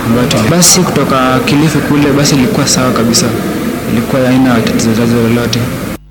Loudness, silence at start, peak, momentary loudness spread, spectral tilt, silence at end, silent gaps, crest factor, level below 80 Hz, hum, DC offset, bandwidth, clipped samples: -9 LUFS; 0 s; 0 dBFS; 8 LU; -4.5 dB/octave; 0.15 s; none; 10 dB; -32 dBFS; none; under 0.1%; over 20 kHz; 0.3%